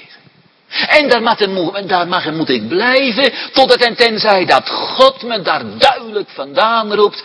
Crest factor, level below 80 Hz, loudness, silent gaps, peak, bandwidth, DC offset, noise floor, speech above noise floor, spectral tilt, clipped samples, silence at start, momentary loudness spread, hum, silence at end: 14 dB; -56 dBFS; -13 LUFS; none; 0 dBFS; 11 kHz; under 0.1%; -49 dBFS; 36 dB; -4 dB/octave; 0.4%; 0.7 s; 9 LU; none; 0 s